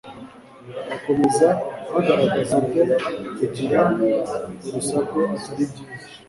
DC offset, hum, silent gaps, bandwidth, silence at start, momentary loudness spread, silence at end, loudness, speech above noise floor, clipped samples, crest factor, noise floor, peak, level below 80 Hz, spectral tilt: under 0.1%; none; none; 11.5 kHz; 0.05 s; 14 LU; 0.1 s; -21 LUFS; 20 dB; under 0.1%; 18 dB; -42 dBFS; -4 dBFS; -58 dBFS; -5.5 dB/octave